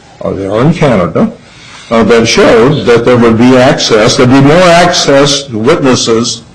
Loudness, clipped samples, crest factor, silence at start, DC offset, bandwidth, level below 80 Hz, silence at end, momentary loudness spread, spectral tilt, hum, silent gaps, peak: -6 LUFS; 0.4%; 6 dB; 0.2 s; under 0.1%; 11.5 kHz; -32 dBFS; 0.1 s; 7 LU; -5 dB/octave; none; none; 0 dBFS